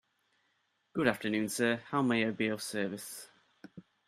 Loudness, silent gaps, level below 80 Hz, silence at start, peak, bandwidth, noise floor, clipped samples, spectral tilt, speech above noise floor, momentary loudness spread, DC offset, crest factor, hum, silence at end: -33 LUFS; none; -74 dBFS; 0.95 s; -12 dBFS; 15.5 kHz; -77 dBFS; under 0.1%; -4.5 dB/octave; 44 dB; 12 LU; under 0.1%; 24 dB; none; 0.25 s